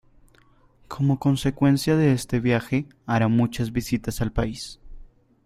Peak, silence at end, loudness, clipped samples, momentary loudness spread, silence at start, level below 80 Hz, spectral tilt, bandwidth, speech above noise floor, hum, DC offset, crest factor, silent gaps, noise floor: -6 dBFS; 0.4 s; -23 LUFS; under 0.1%; 8 LU; 0.9 s; -42 dBFS; -6.5 dB/octave; 15.5 kHz; 35 dB; none; under 0.1%; 18 dB; none; -57 dBFS